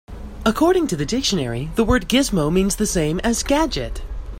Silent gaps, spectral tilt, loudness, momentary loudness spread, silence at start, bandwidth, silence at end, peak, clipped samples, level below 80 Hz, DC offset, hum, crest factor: none; -4.5 dB/octave; -19 LUFS; 7 LU; 0.1 s; 16.5 kHz; 0 s; -4 dBFS; under 0.1%; -32 dBFS; under 0.1%; none; 16 dB